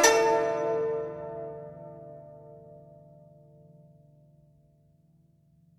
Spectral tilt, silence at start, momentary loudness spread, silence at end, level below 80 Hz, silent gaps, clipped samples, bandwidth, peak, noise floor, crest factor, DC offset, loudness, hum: -2 dB/octave; 0 s; 26 LU; 3 s; -68 dBFS; none; under 0.1%; 16.5 kHz; -6 dBFS; -63 dBFS; 26 dB; under 0.1%; -28 LUFS; none